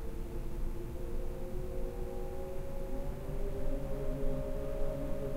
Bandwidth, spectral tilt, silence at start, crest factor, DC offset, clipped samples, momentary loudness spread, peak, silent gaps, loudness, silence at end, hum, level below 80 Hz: 15.5 kHz; -7.5 dB/octave; 0 s; 14 dB; under 0.1%; under 0.1%; 4 LU; -20 dBFS; none; -41 LUFS; 0 s; none; -36 dBFS